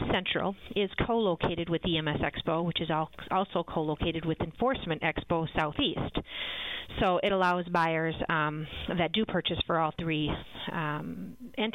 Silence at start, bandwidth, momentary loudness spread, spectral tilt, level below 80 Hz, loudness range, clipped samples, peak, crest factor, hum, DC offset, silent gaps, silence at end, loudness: 0 s; 10.5 kHz; 7 LU; -7 dB/octave; -48 dBFS; 2 LU; under 0.1%; -12 dBFS; 18 dB; none; under 0.1%; none; 0.05 s; -30 LUFS